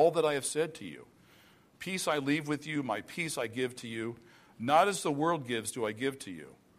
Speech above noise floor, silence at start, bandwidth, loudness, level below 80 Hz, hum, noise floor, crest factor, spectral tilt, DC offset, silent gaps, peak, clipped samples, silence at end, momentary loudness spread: 29 dB; 0 s; 15 kHz; -32 LUFS; -74 dBFS; none; -61 dBFS; 20 dB; -4 dB/octave; under 0.1%; none; -12 dBFS; under 0.1%; 0.25 s; 18 LU